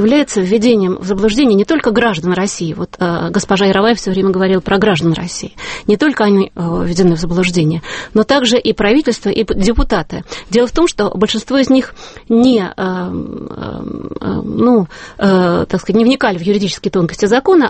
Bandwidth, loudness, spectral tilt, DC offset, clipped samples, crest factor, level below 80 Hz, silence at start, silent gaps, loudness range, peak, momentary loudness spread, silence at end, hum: 8.8 kHz; -13 LUFS; -5.5 dB/octave; under 0.1%; under 0.1%; 12 dB; -32 dBFS; 0 s; none; 2 LU; 0 dBFS; 10 LU; 0 s; none